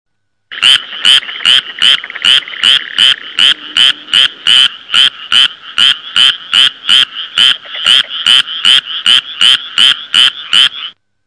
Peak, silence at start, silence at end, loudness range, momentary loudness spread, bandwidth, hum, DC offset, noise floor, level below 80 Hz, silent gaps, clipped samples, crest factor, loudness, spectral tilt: 0 dBFS; 0.5 s; 0.35 s; 1 LU; 2 LU; 11 kHz; none; 0.2%; -34 dBFS; -56 dBFS; none; 4%; 10 dB; -7 LUFS; 2 dB/octave